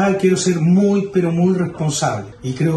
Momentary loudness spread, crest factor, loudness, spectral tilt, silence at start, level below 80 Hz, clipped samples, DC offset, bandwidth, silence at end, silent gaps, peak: 7 LU; 12 dB; -17 LUFS; -6 dB/octave; 0 s; -50 dBFS; under 0.1%; under 0.1%; 12 kHz; 0 s; none; -4 dBFS